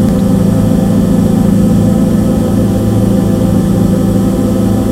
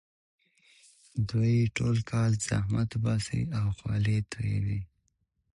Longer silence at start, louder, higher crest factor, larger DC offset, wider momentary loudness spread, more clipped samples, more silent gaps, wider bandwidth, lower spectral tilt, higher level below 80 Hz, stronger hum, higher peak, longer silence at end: second, 0 s vs 1.15 s; first, -10 LUFS vs -30 LUFS; about the same, 10 dB vs 14 dB; neither; second, 2 LU vs 8 LU; neither; neither; first, 16 kHz vs 11 kHz; first, -8 dB/octave vs -6 dB/octave; first, -24 dBFS vs -50 dBFS; neither; first, 0 dBFS vs -16 dBFS; second, 0 s vs 0.7 s